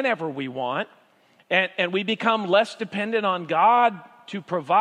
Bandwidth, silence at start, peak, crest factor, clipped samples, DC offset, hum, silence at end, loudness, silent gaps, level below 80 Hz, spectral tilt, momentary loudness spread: 11 kHz; 0 s; -4 dBFS; 18 dB; under 0.1%; under 0.1%; none; 0 s; -23 LUFS; none; -80 dBFS; -5.5 dB/octave; 11 LU